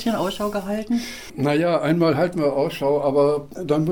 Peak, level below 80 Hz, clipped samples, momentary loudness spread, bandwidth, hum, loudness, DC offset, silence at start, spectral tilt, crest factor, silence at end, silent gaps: -8 dBFS; -50 dBFS; under 0.1%; 7 LU; 18 kHz; none; -21 LUFS; 0.4%; 0 s; -6.5 dB/octave; 14 dB; 0 s; none